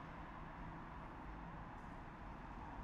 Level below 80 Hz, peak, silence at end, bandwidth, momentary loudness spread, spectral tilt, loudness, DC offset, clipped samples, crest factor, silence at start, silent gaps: -58 dBFS; -38 dBFS; 0 s; 10 kHz; 1 LU; -7.5 dB/octave; -53 LUFS; under 0.1%; under 0.1%; 14 dB; 0 s; none